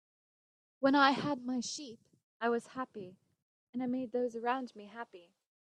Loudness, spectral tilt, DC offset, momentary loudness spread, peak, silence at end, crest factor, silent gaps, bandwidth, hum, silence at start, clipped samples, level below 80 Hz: -34 LUFS; -4 dB/octave; under 0.1%; 20 LU; -12 dBFS; 0.45 s; 26 dB; 2.23-2.40 s, 3.42-3.73 s; 10 kHz; none; 0.8 s; under 0.1%; -82 dBFS